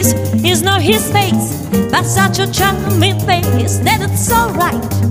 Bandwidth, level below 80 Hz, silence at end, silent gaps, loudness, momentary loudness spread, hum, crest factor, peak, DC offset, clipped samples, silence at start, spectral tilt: 16 kHz; -34 dBFS; 0 s; none; -13 LUFS; 4 LU; none; 12 dB; 0 dBFS; under 0.1%; under 0.1%; 0 s; -4.5 dB/octave